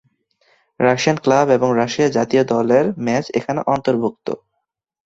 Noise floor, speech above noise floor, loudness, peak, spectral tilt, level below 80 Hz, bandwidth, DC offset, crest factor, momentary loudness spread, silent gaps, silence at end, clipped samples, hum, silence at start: -75 dBFS; 59 dB; -17 LUFS; -2 dBFS; -5.5 dB/octave; -58 dBFS; 8 kHz; under 0.1%; 16 dB; 7 LU; none; 0.7 s; under 0.1%; none; 0.8 s